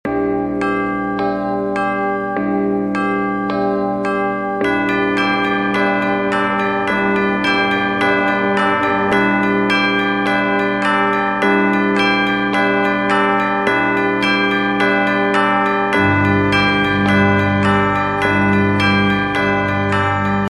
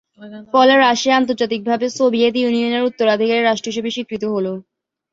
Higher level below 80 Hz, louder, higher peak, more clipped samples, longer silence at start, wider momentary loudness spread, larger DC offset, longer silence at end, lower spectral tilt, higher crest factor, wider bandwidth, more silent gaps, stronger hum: first, -44 dBFS vs -62 dBFS; about the same, -16 LUFS vs -16 LUFS; about the same, 0 dBFS vs 0 dBFS; neither; second, 0.05 s vs 0.2 s; second, 5 LU vs 11 LU; neither; second, 0.05 s vs 0.5 s; first, -6.5 dB/octave vs -4 dB/octave; about the same, 16 dB vs 16 dB; first, 12.5 kHz vs 7.8 kHz; neither; first, 60 Hz at -60 dBFS vs none